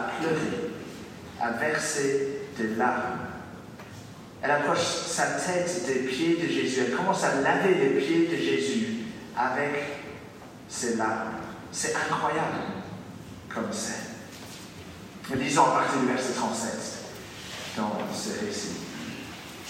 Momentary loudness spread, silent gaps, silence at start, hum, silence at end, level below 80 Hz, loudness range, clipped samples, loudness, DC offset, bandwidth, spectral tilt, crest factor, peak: 18 LU; none; 0 s; none; 0 s; -64 dBFS; 6 LU; under 0.1%; -28 LUFS; under 0.1%; 16 kHz; -4 dB/octave; 20 dB; -8 dBFS